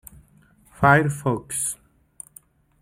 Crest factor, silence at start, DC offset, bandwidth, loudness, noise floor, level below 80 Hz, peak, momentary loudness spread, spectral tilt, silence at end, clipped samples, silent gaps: 22 dB; 0.8 s; under 0.1%; 16 kHz; -21 LUFS; -56 dBFS; -52 dBFS; -2 dBFS; 25 LU; -5.5 dB/octave; 1.05 s; under 0.1%; none